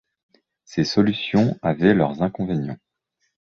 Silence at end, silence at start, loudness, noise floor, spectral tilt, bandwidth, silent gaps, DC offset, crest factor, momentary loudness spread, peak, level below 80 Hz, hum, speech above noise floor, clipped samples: 0.7 s; 0.7 s; -21 LUFS; -73 dBFS; -7 dB/octave; 7 kHz; none; under 0.1%; 18 dB; 11 LU; -4 dBFS; -52 dBFS; none; 53 dB; under 0.1%